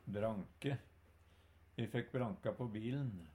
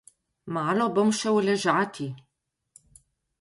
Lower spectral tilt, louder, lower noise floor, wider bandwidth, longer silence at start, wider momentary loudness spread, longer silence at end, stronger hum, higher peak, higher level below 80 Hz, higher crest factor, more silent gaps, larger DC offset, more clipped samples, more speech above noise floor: first, -8 dB/octave vs -5 dB/octave; second, -43 LUFS vs -25 LUFS; first, -67 dBFS vs -60 dBFS; first, 15.5 kHz vs 11.5 kHz; second, 0.05 s vs 0.45 s; second, 5 LU vs 13 LU; second, 0 s vs 1.2 s; neither; second, -26 dBFS vs -10 dBFS; about the same, -68 dBFS vs -70 dBFS; about the same, 18 dB vs 18 dB; neither; neither; neither; second, 25 dB vs 36 dB